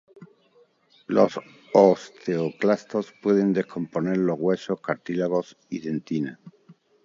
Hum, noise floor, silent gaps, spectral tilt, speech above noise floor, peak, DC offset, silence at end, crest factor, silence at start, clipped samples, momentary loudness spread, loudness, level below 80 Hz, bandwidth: none; -60 dBFS; none; -7.5 dB/octave; 37 dB; -2 dBFS; under 0.1%; 0.35 s; 22 dB; 0.2 s; under 0.1%; 11 LU; -24 LUFS; -70 dBFS; 7.6 kHz